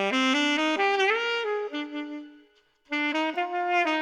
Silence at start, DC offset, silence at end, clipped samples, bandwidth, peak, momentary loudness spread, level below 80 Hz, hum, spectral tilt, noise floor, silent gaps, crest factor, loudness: 0 s; under 0.1%; 0 s; under 0.1%; 10.5 kHz; -12 dBFS; 12 LU; -78 dBFS; none; -2.5 dB/octave; -61 dBFS; none; 14 dB; -26 LUFS